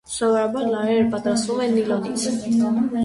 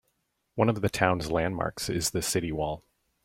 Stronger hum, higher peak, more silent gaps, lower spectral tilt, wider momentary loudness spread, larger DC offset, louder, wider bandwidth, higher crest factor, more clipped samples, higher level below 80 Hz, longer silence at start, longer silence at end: neither; about the same, -8 dBFS vs -6 dBFS; neither; about the same, -5 dB/octave vs -4.5 dB/octave; second, 3 LU vs 8 LU; neither; first, -21 LUFS vs -28 LUFS; second, 11.5 kHz vs 16.5 kHz; second, 12 dB vs 24 dB; neither; second, -56 dBFS vs -50 dBFS; second, 0.1 s vs 0.55 s; second, 0 s vs 0.45 s